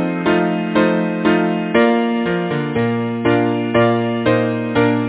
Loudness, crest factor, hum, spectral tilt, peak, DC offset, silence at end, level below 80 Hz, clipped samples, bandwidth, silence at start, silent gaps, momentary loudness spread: -17 LUFS; 16 dB; none; -11 dB/octave; 0 dBFS; under 0.1%; 0 s; -48 dBFS; under 0.1%; 4 kHz; 0 s; none; 4 LU